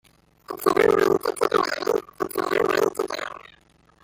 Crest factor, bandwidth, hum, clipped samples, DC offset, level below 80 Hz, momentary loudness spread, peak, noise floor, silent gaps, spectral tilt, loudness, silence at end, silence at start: 20 dB; 17 kHz; none; under 0.1%; under 0.1%; -58 dBFS; 13 LU; -4 dBFS; -57 dBFS; none; -4 dB/octave; -23 LUFS; 0.65 s; 0.5 s